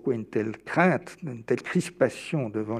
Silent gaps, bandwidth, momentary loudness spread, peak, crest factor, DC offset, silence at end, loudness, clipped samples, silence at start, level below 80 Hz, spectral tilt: none; 13.5 kHz; 8 LU; -6 dBFS; 22 dB; under 0.1%; 0 s; -27 LUFS; under 0.1%; 0.05 s; -68 dBFS; -6.5 dB/octave